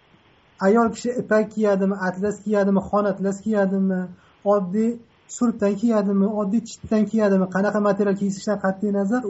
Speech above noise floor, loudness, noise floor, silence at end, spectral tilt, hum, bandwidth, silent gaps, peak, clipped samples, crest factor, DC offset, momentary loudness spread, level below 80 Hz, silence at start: 35 dB; -22 LUFS; -56 dBFS; 0 s; -7.5 dB/octave; none; 8 kHz; none; -8 dBFS; under 0.1%; 14 dB; under 0.1%; 6 LU; -58 dBFS; 0.6 s